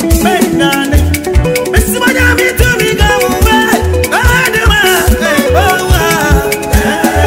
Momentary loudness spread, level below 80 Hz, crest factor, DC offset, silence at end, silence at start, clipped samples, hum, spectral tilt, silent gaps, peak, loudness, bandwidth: 3 LU; -16 dBFS; 8 dB; under 0.1%; 0 s; 0 s; 0.2%; none; -4.5 dB/octave; none; 0 dBFS; -9 LUFS; 16.5 kHz